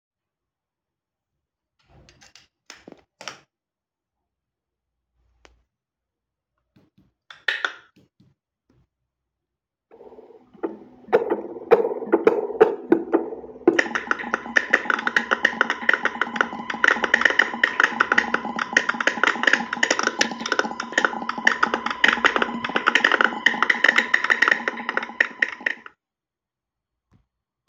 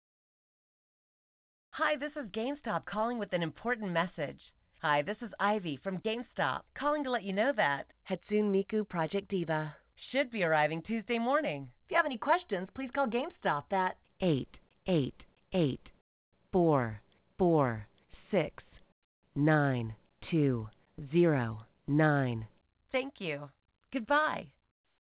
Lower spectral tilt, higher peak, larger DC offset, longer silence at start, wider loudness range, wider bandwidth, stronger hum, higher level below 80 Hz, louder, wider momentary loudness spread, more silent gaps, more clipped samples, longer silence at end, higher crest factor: second, -2.5 dB/octave vs -5 dB/octave; first, 0 dBFS vs -16 dBFS; neither; first, 2.7 s vs 1.75 s; first, 15 LU vs 3 LU; first, 16 kHz vs 4 kHz; neither; about the same, -66 dBFS vs -64 dBFS; first, -21 LUFS vs -33 LUFS; about the same, 10 LU vs 12 LU; second, none vs 16.01-16.32 s, 18.92-19.23 s; neither; first, 1.9 s vs 0.6 s; first, 24 dB vs 18 dB